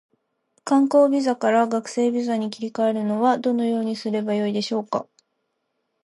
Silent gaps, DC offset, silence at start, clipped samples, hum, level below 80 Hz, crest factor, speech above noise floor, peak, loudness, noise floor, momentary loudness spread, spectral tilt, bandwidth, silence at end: none; under 0.1%; 0.65 s; under 0.1%; none; -76 dBFS; 16 dB; 54 dB; -6 dBFS; -22 LUFS; -75 dBFS; 8 LU; -5.5 dB/octave; 11.5 kHz; 1 s